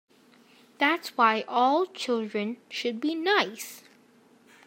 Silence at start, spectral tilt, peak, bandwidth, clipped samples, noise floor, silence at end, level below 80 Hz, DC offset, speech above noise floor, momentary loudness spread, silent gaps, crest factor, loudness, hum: 0.8 s; -3.5 dB/octave; -8 dBFS; 16 kHz; under 0.1%; -59 dBFS; 0.85 s; -90 dBFS; under 0.1%; 32 dB; 9 LU; none; 20 dB; -26 LUFS; none